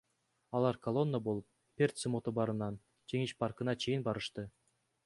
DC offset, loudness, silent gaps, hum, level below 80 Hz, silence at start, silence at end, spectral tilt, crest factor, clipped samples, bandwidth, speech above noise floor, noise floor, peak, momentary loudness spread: under 0.1%; -36 LUFS; none; none; -68 dBFS; 0.5 s; 0.55 s; -6 dB/octave; 20 dB; under 0.1%; 11.5 kHz; 38 dB; -73 dBFS; -16 dBFS; 9 LU